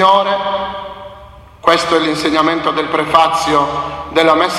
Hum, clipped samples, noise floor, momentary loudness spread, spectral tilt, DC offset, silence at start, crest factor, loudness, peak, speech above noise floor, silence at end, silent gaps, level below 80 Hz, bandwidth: none; under 0.1%; -37 dBFS; 13 LU; -4 dB/octave; under 0.1%; 0 s; 14 dB; -14 LUFS; 0 dBFS; 24 dB; 0 s; none; -44 dBFS; 14.5 kHz